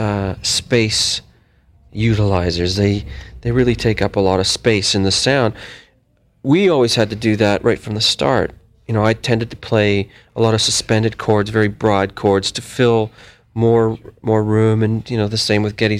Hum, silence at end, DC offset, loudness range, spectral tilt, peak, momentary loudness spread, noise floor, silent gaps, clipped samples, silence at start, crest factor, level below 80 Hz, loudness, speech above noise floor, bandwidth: none; 0 s; under 0.1%; 2 LU; -5 dB/octave; 0 dBFS; 7 LU; -57 dBFS; none; under 0.1%; 0 s; 16 dB; -40 dBFS; -16 LUFS; 41 dB; 14.5 kHz